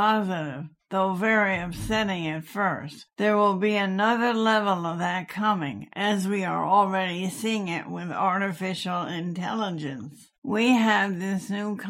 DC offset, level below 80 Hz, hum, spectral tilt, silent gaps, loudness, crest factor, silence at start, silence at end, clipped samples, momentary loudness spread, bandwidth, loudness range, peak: under 0.1%; -56 dBFS; none; -5.5 dB/octave; 10.38-10.42 s; -25 LUFS; 18 dB; 0 s; 0 s; under 0.1%; 10 LU; 16.5 kHz; 3 LU; -8 dBFS